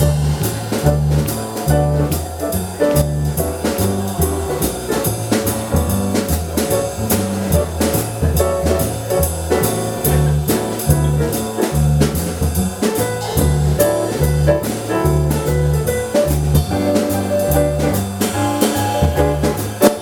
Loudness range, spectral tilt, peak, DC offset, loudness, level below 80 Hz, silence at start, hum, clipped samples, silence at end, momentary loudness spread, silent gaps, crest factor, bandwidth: 2 LU; -5.5 dB/octave; 0 dBFS; under 0.1%; -17 LUFS; -26 dBFS; 0 s; none; under 0.1%; 0 s; 4 LU; none; 16 dB; over 20 kHz